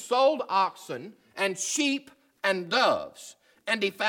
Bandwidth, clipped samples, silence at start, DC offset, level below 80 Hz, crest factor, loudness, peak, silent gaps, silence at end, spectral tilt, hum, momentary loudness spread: 18 kHz; under 0.1%; 0 s; under 0.1%; -78 dBFS; 18 dB; -27 LUFS; -10 dBFS; none; 0 s; -2 dB/octave; none; 17 LU